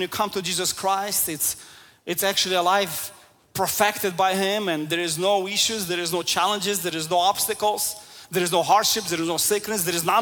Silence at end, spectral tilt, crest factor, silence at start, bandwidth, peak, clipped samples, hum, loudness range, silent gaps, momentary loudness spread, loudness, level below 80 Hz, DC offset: 0 s; -2 dB/octave; 18 dB; 0 s; 18 kHz; -6 dBFS; under 0.1%; none; 1 LU; none; 7 LU; -22 LUFS; -62 dBFS; under 0.1%